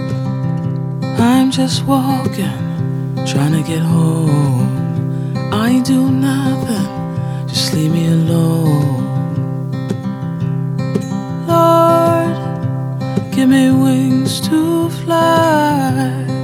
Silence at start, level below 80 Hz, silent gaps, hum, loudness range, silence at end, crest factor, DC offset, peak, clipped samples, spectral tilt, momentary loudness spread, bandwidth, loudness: 0 s; -48 dBFS; none; none; 3 LU; 0 s; 14 dB; under 0.1%; 0 dBFS; under 0.1%; -6.5 dB/octave; 9 LU; 16.5 kHz; -15 LUFS